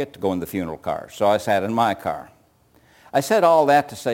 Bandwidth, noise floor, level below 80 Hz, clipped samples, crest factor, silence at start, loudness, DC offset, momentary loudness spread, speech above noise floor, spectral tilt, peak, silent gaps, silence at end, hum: 17 kHz; -57 dBFS; -58 dBFS; under 0.1%; 16 dB; 0 s; -20 LUFS; under 0.1%; 13 LU; 37 dB; -5 dB/octave; -4 dBFS; none; 0 s; none